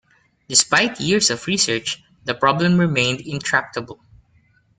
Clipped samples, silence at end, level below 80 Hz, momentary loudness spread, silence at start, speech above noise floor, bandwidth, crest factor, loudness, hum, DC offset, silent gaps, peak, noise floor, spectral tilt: under 0.1%; 0.85 s; -56 dBFS; 12 LU; 0.5 s; 39 dB; 9.6 kHz; 20 dB; -18 LUFS; none; under 0.1%; none; 0 dBFS; -58 dBFS; -3 dB/octave